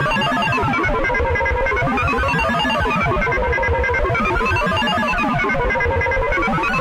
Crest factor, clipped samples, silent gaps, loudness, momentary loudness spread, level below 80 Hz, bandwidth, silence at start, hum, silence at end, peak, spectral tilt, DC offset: 12 dB; under 0.1%; none; -18 LUFS; 1 LU; -28 dBFS; 16 kHz; 0 s; none; 0 s; -6 dBFS; -5.5 dB/octave; under 0.1%